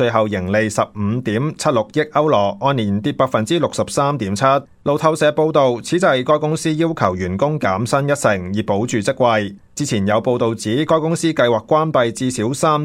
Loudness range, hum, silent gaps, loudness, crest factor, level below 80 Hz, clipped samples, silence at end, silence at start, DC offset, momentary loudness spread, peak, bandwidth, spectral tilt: 2 LU; none; none; -17 LUFS; 16 dB; -52 dBFS; under 0.1%; 0 s; 0 s; under 0.1%; 5 LU; 0 dBFS; 15.5 kHz; -5.5 dB/octave